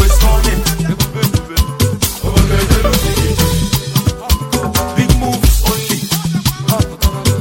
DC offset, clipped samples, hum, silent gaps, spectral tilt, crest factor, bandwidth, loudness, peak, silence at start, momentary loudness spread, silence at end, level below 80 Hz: under 0.1%; under 0.1%; none; none; -4.5 dB/octave; 12 dB; 17 kHz; -14 LUFS; 0 dBFS; 0 s; 4 LU; 0 s; -16 dBFS